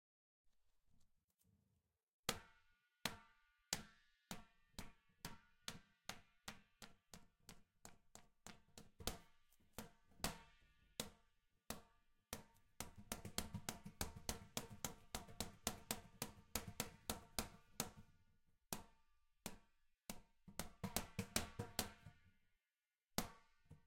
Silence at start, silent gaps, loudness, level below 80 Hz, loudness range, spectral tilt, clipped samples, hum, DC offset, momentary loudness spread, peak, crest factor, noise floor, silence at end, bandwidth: 0.45 s; 1.24-1.28 s, 1.34-1.38 s, 2.03-2.07 s, 2.14-2.23 s; -51 LUFS; -66 dBFS; 9 LU; -2.5 dB/octave; under 0.1%; none; under 0.1%; 17 LU; -18 dBFS; 36 dB; under -90 dBFS; 0.05 s; 16.5 kHz